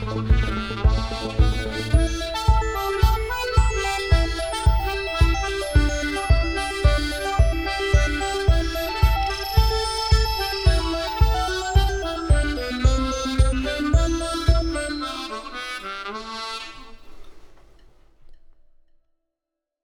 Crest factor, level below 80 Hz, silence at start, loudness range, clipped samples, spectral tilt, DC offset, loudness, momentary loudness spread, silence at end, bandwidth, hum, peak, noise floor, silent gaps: 18 dB; -24 dBFS; 0 s; 10 LU; under 0.1%; -5 dB/octave; under 0.1%; -23 LUFS; 7 LU; 1.35 s; 17.5 kHz; none; -4 dBFS; -85 dBFS; none